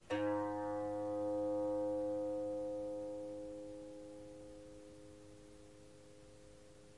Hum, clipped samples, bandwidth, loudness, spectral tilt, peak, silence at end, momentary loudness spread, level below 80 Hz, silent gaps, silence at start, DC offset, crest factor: none; under 0.1%; 11.5 kHz; -41 LUFS; -6.5 dB/octave; -26 dBFS; 0 s; 22 LU; -70 dBFS; none; 0 s; under 0.1%; 16 dB